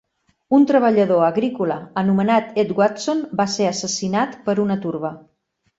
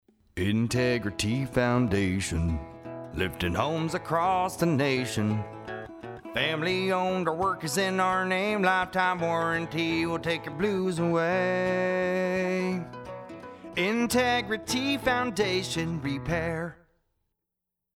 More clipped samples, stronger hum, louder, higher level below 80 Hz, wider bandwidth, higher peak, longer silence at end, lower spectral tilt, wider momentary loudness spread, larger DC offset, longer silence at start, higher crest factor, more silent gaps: neither; neither; first, -19 LUFS vs -27 LUFS; second, -62 dBFS vs -48 dBFS; second, 8 kHz vs 16.5 kHz; first, -2 dBFS vs -10 dBFS; second, 0.6 s vs 1.25 s; about the same, -5.5 dB/octave vs -5 dB/octave; second, 8 LU vs 12 LU; neither; first, 0.5 s vs 0.35 s; about the same, 16 dB vs 18 dB; neither